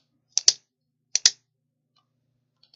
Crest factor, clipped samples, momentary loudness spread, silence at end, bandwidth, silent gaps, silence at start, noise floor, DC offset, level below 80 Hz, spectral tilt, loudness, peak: 28 dB; under 0.1%; 8 LU; 1.45 s; 12 kHz; none; 0.35 s; -78 dBFS; under 0.1%; -84 dBFS; 4 dB/octave; -21 LUFS; 0 dBFS